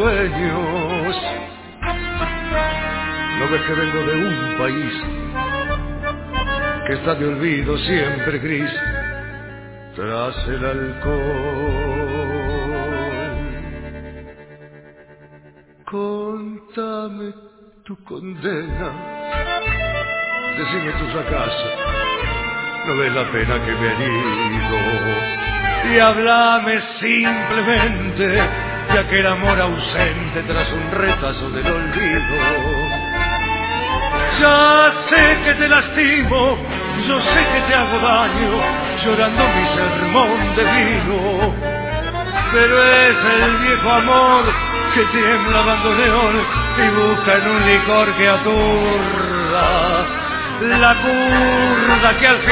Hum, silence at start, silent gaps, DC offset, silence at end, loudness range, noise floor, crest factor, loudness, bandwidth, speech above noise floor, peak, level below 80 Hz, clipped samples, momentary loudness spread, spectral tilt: none; 0 s; none; under 0.1%; 0 s; 12 LU; -47 dBFS; 18 dB; -16 LUFS; 4 kHz; 31 dB; 0 dBFS; -30 dBFS; under 0.1%; 13 LU; -9 dB/octave